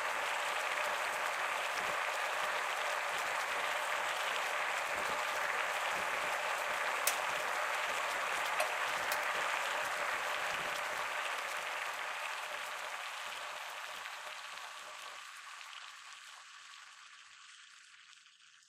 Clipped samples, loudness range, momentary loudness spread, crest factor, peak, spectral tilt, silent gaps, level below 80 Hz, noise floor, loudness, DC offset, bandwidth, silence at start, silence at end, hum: under 0.1%; 13 LU; 16 LU; 22 dB; -16 dBFS; 0.5 dB/octave; none; -78 dBFS; -62 dBFS; -36 LUFS; under 0.1%; 16 kHz; 0 s; 0.1 s; none